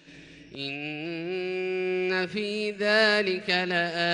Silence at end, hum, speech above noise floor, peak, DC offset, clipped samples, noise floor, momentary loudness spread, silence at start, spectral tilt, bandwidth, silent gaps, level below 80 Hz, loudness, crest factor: 0 s; none; 22 dB; -10 dBFS; under 0.1%; under 0.1%; -49 dBFS; 12 LU; 0.05 s; -4.5 dB/octave; 10.5 kHz; none; -70 dBFS; -27 LUFS; 18 dB